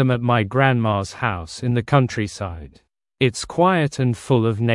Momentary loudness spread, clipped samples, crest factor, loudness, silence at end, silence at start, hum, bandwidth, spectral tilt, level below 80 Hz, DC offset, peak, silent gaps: 9 LU; under 0.1%; 18 dB; -20 LUFS; 0 s; 0 s; none; 11.5 kHz; -6.5 dB/octave; -50 dBFS; under 0.1%; 0 dBFS; none